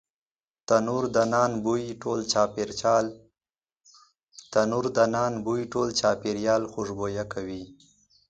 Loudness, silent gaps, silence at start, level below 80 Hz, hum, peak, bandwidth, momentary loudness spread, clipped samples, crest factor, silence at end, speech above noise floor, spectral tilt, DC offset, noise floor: -26 LUFS; 4.23-4.27 s; 0.7 s; -58 dBFS; none; -6 dBFS; 9.2 kHz; 9 LU; under 0.1%; 20 dB; 0.55 s; over 64 dB; -4.5 dB/octave; under 0.1%; under -90 dBFS